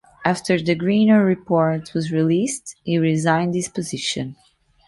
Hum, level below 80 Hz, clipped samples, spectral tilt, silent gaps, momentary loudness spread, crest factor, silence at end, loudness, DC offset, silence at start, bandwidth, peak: none; -58 dBFS; under 0.1%; -5.5 dB/octave; none; 10 LU; 18 dB; 0.55 s; -20 LUFS; under 0.1%; 0.2 s; 11.5 kHz; -2 dBFS